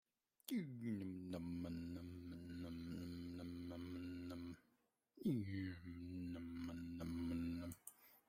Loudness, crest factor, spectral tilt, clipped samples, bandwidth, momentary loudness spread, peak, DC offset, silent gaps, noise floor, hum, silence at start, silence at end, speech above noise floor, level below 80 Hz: -49 LUFS; 20 dB; -7 dB/octave; under 0.1%; 16 kHz; 9 LU; -30 dBFS; under 0.1%; none; -83 dBFS; none; 0.5 s; 0.1 s; 38 dB; -72 dBFS